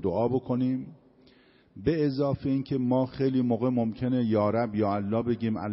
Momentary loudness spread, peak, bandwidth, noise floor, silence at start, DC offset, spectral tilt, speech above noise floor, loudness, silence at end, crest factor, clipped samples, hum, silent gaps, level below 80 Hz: 4 LU; -12 dBFS; 5.8 kHz; -59 dBFS; 0 s; under 0.1%; -8 dB/octave; 32 dB; -27 LUFS; 0 s; 14 dB; under 0.1%; none; none; -56 dBFS